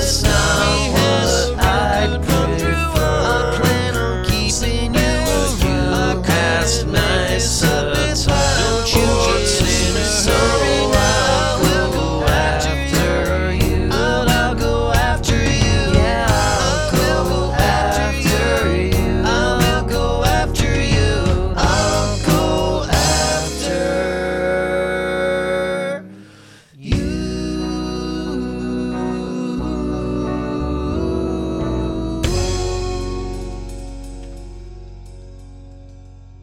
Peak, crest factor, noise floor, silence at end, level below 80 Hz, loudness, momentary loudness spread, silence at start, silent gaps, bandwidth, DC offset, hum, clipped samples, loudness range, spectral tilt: 0 dBFS; 18 dB; -44 dBFS; 0 s; -24 dBFS; -17 LUFS; 8 LU; 0 s; none; 19.5 kHz; under 0.1%; none; under 0.1%; 8 LU; -4.5 dB/octave